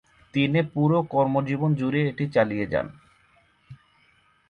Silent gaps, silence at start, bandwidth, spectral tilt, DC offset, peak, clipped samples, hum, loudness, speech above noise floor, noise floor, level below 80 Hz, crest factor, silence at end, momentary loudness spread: none; 0.35 s; 6.6 kHz; -9 dB/octave; under 0.1%; -10 dBFS; under 0.1%; none; -24 LUFS; 39 dB; -62 dBFS; -58 dBFS; 16 dB; 0.75 s; 6 LU